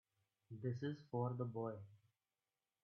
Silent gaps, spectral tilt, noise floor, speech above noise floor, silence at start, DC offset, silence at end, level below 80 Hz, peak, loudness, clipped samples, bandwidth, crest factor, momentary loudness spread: none; -8 dB/octave; under -90 dBFS; over 45 dB; 0.5 s; under 0.1%; 0.9 s; -86 dBFS; -30 dBFS; -46 LUFS; under 0.1%; 6.4 kHz; 18 dB; 14 LU